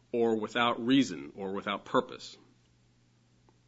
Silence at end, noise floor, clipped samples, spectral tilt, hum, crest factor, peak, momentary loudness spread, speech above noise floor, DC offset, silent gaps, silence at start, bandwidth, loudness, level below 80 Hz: 1.35 s; -66 dBFS; under 0.1%; -5 dB/octave; none; 20 dB; -12 dBFS; 16 LU; 36 dB; under 0.1%; none; 0.15 s; 8 kHz; -30 LUFS; -74 dBFS